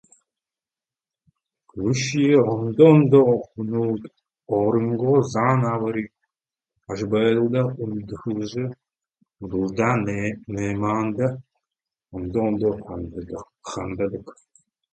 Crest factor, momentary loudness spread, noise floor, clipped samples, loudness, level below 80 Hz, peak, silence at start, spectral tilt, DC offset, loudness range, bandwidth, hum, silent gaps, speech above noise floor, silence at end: 20 dB; 17 LU; under -90 dBFS; under 0.1%; -22 LUFS; -52 dBFS; -2 dBFS; 1.75 s; -7 dB/octave; under 0.1%; 8 LU; 8.8 kHz; none; none; over 69 dB; 0.6 s